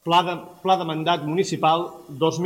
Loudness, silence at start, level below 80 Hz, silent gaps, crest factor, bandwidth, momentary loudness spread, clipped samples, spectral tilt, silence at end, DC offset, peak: -22 LUFS; 0.05 s; -68 dBFS; none; 16 dB; 16.5 kHz; 8 LU; under 0.1%; -5 dB/octave; 0 s; under 0.1%; -6 dBFS